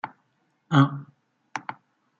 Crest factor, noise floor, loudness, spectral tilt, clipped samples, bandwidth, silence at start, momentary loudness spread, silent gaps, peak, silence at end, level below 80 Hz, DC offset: 22 dB; -70 dBFS; -24 LUFS; -7 dB/octave; under 0.1%; 7.2 kHz; 0.05 s; 19 LU; none; -6 dBFS; 0.45 s; -68 dBFS; under 0.1%